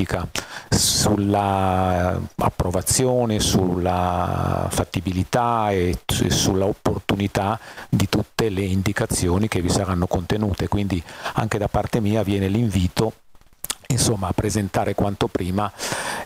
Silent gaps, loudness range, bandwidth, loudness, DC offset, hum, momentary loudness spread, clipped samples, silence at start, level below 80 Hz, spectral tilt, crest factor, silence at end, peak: none; 3 LU; 16 kHz; -22 LUFS; under 0.1%; none; 6 LU; under 0.1%; 0 s; -38 dBFS; -5 dB/octave; 20 dB; 0 s; 0 dBFS